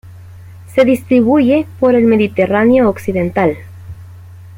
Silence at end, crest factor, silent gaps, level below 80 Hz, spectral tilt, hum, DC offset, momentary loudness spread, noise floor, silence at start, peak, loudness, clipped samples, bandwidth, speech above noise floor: 0 s; 12 dB; none; -46 dBFS; -7.5 dB/octave; none; under 0.1%; 14 LU; -34 dBFS; 0.05 s; -2 dBFS; -12 LUFS; under 0.1%; 16.5 kHz; 23 dB